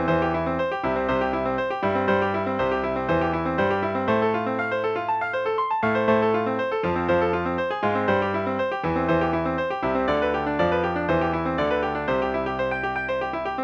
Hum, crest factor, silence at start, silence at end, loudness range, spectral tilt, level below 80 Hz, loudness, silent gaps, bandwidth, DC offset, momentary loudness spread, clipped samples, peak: none; 14 dB; 0 s; 0 s; 1 LU; -7.5 dB/octave; -48 dBFS; -24 LUFS; none; 7.2 kHz; under 0.1%; 3 LU; under 0.1%; -10 dBFS